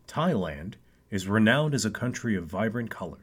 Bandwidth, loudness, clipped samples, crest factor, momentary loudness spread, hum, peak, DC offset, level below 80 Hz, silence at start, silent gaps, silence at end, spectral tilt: 16 kHz; -27 LUFS; under 0.1%; 20 dB; 14 LU; none; -8 dBFS; under 0.1%; -54 dBFS; 0.1 s; none; 0.05 s; -5.5 dB/octave